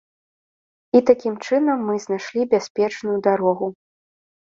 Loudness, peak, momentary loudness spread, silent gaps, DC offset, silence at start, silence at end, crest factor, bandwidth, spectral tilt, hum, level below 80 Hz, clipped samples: -20 LUFS; -2 dBFS; 8 LU; 2.70-2.75 s; under 0.1%; 0.95 s; 0.85 s; 20 dB; 7.6 kHz; -6 dB/octave; none; -68 dBFS; under 0.1%